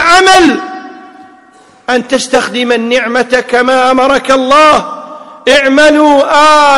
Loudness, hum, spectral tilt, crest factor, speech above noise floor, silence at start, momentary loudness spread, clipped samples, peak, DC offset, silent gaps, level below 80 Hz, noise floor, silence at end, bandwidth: -7 LUFS; none; -2.5 dB/octave; 8 dB; 33 dB; 0 s; 14 LU; 0.6%; 0 dBFS; under 0.1%; none; -42 dBFS; -41 dBFS; 0 s; 14 kHz